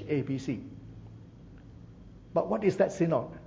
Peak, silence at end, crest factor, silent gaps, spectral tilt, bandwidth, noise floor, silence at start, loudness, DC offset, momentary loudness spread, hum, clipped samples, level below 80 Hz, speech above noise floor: -12 dBFS; 0 s; 20 dB; none; -7.5 dB/octave; 8 kHz; -50 dBFS; 0 s; -30 LUFS; under 0.1%; 24 LU; none; under 0.1%; -56 dBFS; 21 dB